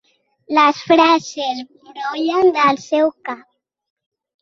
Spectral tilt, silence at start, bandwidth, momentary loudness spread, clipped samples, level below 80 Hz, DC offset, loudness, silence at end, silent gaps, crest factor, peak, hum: -3.5 dB/octave; 0.5 s; 7.6 kHz; 17 LU; under 0.1%; -64 dBFS; under 0.1%; -16 LUFS; 1.05 s; none; 16 dB; -2 dBFS; none